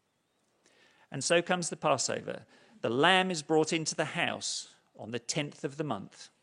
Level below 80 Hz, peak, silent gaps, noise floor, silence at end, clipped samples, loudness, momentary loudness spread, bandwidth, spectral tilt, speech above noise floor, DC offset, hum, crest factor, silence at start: -78 dBFS; -8 dBFS; none; -76 dBFS; 0.15 s; under 0.1%; -30 LUFS; 17 LU; 11 kHz; -3 dB/octave; 44 dB; under 0.1%; none; 24 dB; 1.1 s